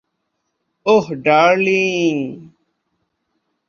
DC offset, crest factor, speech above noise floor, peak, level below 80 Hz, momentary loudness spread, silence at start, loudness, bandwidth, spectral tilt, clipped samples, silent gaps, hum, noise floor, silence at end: under 0.1%; 18 dB; 58 dB; -2 dBFS; -64 dBFS; 12 LU; 0.85 s; -15 LUFS; 7.2 kHz; -5 dB/octave; under 0.1%; none; none; -73 dBFS; 1.25 s